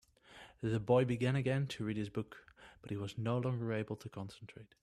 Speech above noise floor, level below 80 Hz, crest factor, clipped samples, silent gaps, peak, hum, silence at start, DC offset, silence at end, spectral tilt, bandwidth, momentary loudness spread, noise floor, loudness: 23 dB; -68 dBFS; 20 dB; under 0.1%; none; -16 dBFS; none; 0.3 s; under 0.1%; 0.15 s; -7.5 dB/octave; 12 kHz; 23 LU; -59 dBFS; -37 LUFS